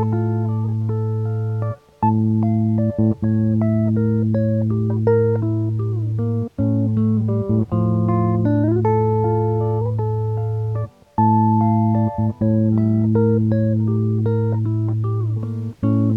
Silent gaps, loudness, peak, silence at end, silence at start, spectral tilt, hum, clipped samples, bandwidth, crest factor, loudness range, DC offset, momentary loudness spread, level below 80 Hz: none; -19 LUFS; -6 dBFS; 0 s; 0 s; -12 dB/octave; none; under 0.1%; 2.3 kHz; 12 dB; 2 LU; under 0.1%; 6 LU; -46 dBFS